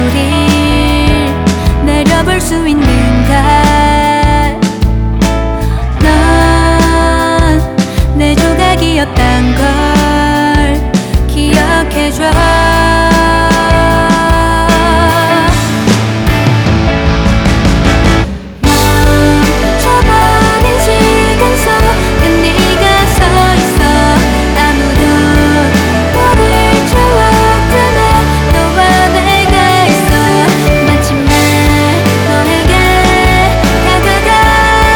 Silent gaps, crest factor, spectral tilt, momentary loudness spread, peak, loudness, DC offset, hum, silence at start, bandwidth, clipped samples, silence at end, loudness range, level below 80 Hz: none; 8 dB; -5 dB/octave; 4 LU; 0 dBFS; -8 LUFS; under 0.1%; none; 0 s; over 20 kHz; 0.5%; 0 s; 2 LU; -14 dBFS